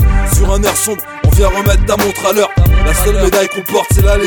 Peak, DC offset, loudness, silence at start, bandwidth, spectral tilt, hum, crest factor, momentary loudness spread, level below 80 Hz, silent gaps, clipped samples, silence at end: 0 dBFS; under 0.1%; -12 LUFS; 0 s; over 20 kHz; -4.5 dB/octave; none; 10 dB; 3 LU; -14 dBFS; none; under 0.1%; 0 s